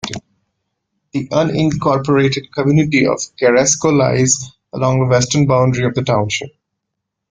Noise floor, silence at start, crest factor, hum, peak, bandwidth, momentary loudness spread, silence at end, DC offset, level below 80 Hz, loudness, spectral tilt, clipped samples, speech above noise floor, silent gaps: -77 dBFS; 0.05 s; 16 dB; none; 0 dBFS; 9.6 kHz; 10 LU; 0.85 s; under 0.1%; -48 dBFS; -15 LUFS; -5 dB/octave; under 0.1%; 63 dB; none